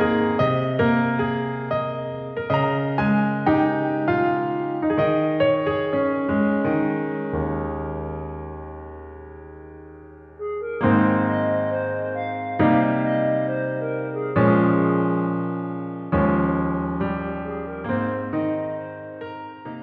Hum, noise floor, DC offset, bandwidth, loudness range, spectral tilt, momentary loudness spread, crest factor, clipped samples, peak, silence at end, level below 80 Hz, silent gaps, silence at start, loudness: none; -43 dBFS; under 0.1%; 5.6 kHz; 6 LU; -10 dB/octave; 16 LU; 16 dB; under 0.1%; -6 dBFS; 0 s; -46 dBFS; none; 0 s; -22 LUFS